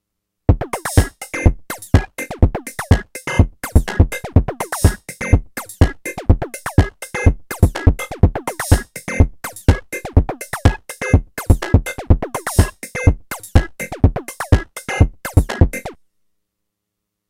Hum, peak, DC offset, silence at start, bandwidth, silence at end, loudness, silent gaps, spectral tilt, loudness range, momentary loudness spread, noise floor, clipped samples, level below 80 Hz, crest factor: none; 0 dBFS; under 0.1%; 0.5 s; 16 kHz; 1.35 s; -18 LUFS; none; -6 dB/octave; 1 LU; 8 LU; -78 dBFS; 0.1%; -22 dBFS; 16 dB